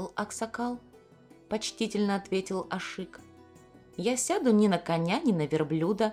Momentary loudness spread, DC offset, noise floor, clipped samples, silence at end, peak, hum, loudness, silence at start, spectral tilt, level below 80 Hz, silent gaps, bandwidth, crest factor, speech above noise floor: 12 LU; under 0.1%; -56 dBFS; under 0.1%; 0 s; -10 dBFS; none; -29 LUFS; 0 s; -5 dB/octave; -64 dBFS; none; 14.5 kHz; 18 dB; 27 dB